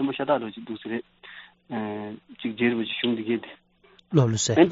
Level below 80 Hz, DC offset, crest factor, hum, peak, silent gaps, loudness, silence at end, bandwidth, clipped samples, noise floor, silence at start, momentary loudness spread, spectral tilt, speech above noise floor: -64 dBFS; under 0.1%; 22 dB; none; -4 dBFS; none; -26 LUFS; 0 s; 7.6 kHz; under 0.1%; -58 dBFS; 0 s; 22 LU; -5 dB/octave; 33 dB